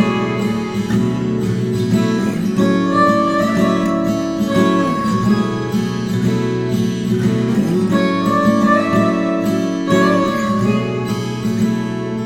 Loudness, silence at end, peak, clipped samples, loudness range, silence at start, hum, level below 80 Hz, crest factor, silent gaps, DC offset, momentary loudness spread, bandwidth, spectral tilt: -16 LUFS; 0 s; -2 dBFS; under 0.1%; 2 LU; 0 s; none; -46 dBFS; 14 dB; none; under 0.1%; 6 LU; 16.5 kHz; -7 dB/octave